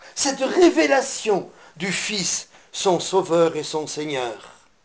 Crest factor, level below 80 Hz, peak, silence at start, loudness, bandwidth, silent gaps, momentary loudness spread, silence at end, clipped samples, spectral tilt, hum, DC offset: 18 dB; -62 dBFS; -4 dBFS; 0 s; -21 LUFS; 10 kHz; none; 12 LU; 0.35 s; under 0.1%; -3 dB/octave; none; under 0.1%